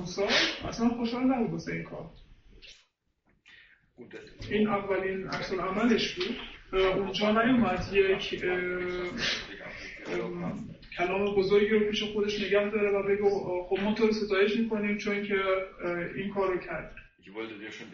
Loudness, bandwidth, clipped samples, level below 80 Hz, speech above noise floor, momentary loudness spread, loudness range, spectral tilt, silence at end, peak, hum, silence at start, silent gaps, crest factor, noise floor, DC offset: -29 LUFS; 7.2 kHz; under 0.1%; -52 dBFS; 43 dB; 15 LU; 7 LU; -5 dB/octave; 0 s; -12 dBFS; none; 0 s; none; 18 dB; -72 dBFS; under 0.1%